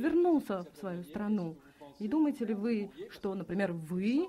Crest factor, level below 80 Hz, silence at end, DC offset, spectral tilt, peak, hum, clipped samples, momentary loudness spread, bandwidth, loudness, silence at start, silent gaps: 12 dB; -68 dBFS; 0 s; under 0.1%; -8 dB/octave; -20 dBFS; none; under 0.1%; 12 LU; 14.5 kHz; -34 LUFS; 0 s; none